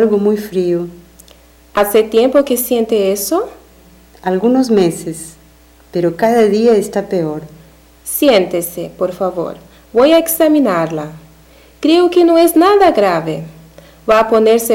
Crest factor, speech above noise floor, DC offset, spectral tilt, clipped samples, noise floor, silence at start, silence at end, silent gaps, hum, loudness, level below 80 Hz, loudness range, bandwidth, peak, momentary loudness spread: 12 dB; 32 dB; under 0.1%; -5 dB/octave; under 0.1%; -45 dBFS; 0 s; 0 s; none; none; -13 LUFS; -46 dBFS; 4 LU; 17.5 kHz; -2 dBFS; 15 LU